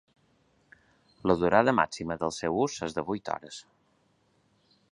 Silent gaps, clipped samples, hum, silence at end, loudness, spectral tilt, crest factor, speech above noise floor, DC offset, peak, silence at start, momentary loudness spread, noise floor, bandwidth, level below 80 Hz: none; under 0.1%; none; 1.3 s; -28 LUFS; -5 dB/octave; 26 dB; 41 dB; under 0.1%; -6 dBFS; 1.25 s; 14 LU; -69 dBFS; 11 kHz; -58 dBFS